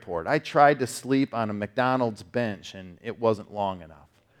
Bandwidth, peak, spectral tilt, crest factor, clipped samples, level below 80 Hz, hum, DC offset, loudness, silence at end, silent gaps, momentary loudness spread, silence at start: 16 kHz; -4 dBFS; -5.5 dB/octave; 22 dB; under 0.1%; -64 dBFS; none; under 0.1%; -26 LUFS; 0.45 s; none; 18 LU; 0.05 s